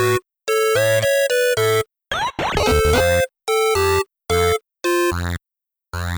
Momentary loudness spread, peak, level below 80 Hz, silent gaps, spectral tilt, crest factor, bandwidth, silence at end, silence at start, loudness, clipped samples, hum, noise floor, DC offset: 8 LU; -4 dBFS; -34 dBFS; none; -4 dB/octave; 14 dB; over 20 kHz; 0 s; 0 s; -18 LUFS; under 0.1%; none; -86 dBFS; under 0.1%